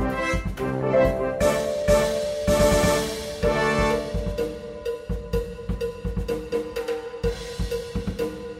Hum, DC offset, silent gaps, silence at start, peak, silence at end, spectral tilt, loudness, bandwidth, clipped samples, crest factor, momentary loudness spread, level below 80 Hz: none; under 0.1%; none; 0 s; -6 dBFS; 0 s; -5 dB/octave; -25 LUFS; 16 kHz; under 0.1%; 18 dB; 10 LU; -34 dBFS